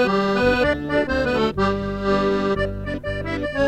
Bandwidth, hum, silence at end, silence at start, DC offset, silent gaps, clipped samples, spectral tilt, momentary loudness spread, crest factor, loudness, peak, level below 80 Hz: 13 kHz; none; 0 s; 0 s; under 0.1%; none; under 0.1%; -6.5 dB/octave; 8 LU; 14 dB; -21 LUFS; -8 dBFS; -36 dBFS